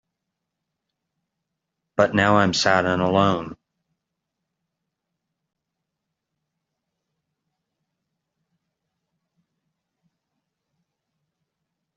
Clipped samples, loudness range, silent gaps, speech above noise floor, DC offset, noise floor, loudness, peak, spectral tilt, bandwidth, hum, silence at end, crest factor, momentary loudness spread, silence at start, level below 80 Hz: under 0.1%; 6 LU; none; 63 dB; under 0.1%; -82 dBFS; -19 LUFS; -2 dBFS; -3.5 dB/octave; 7.6 kHz; none; 8.45 s; 24 dB; 11 LU; 2 s; -62 dBFS